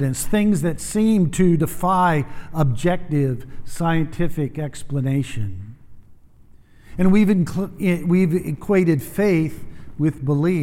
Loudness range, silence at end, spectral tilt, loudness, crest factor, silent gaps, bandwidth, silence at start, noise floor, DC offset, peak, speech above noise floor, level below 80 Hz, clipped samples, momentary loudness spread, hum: 6 LU; 0 s; -7 dB/octave; -20 LUFS; 16 dB; none; 16.5 kHz; 0 s; -47 dBFS; under 0.1%; -4 dBFS; 28 dB; -40 dBFS; under 0.1%; 12 LU; none